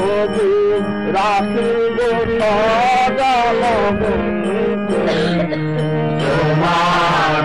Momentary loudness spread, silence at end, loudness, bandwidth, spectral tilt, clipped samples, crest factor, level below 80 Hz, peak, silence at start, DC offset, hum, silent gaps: 4 LU; 0 s; -16 LUFS; 11.5 kHz; -6 dB/octave; under 0.1%; 8 dB; -38 dBFS; -8 dBFS; 0 s; 1%; none; none